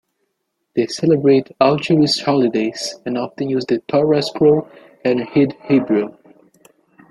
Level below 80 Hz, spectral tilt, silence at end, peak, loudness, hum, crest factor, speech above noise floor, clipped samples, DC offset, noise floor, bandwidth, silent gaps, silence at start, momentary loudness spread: -60 dBFS; -6 dB/octave; 1 s; -2 dBFS; -17 LUFS; none; 16 dB; 56 dB; under 0.1%; under 0.1%; -72 dBFS; 12 kHz; none; 0.75 s; 9 LU